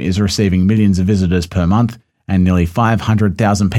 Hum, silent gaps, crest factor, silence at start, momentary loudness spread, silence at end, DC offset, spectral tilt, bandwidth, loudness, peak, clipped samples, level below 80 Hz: none; none; 12 dB; 0 s; 3 LU; 0 s; under 0.1%; -6.5 dB/octave; 13 kHz; -14 LUFS; 0 dBFS; under 0.1%; -34 dBFS